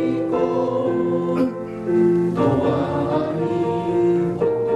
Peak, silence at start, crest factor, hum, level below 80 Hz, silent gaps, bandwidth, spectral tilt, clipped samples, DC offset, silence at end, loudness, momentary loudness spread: -6 dBFS; 0 s; 12 dB; none; -52 dBFS; none; 7.8 kHz; -9 dB/octave; under 0.1%; under 0.1%; 0 s; -20 LUFS; 4 LU